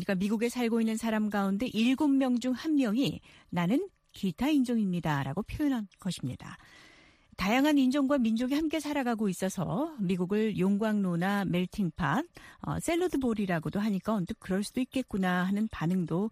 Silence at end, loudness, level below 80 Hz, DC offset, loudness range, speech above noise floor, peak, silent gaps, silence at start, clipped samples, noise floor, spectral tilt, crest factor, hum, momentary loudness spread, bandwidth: 0 s; -30 LUFS; -56 dBFS; under 0.1%; 3 LU; 30 dB; -12 dBFS; none; 0 s; under 0.1%; -59 dBFS; -6 dB/octave; 16 dB; none; 8 LU; 15.5 kHz